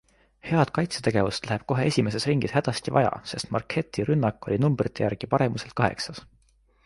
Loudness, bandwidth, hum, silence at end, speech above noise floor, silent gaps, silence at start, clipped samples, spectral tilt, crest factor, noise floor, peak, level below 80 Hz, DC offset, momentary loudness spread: -26 LUFS; 11.5 kHz; none; 0.6 s; 37 dB; none; 0.45 s; under 0.1%; -6 dB/octave; 20 dB; -62 dBFS; -6 dBFS; -52 dBFS; under 0.1%; 6 LU